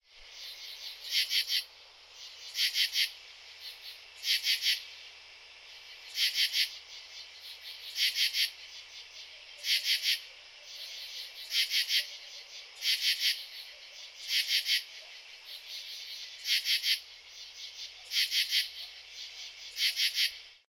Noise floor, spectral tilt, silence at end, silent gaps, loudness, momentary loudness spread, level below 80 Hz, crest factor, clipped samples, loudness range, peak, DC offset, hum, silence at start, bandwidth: -55 dBFS; 5 dB/octave; 0.15 s; none; -30 LUFS; 19 LU; -78 dBFS; 24 dB; under 0.1%; 2 LU; -12 dBFS; under 0.1%; none; 0.15 s; 16.5 kHz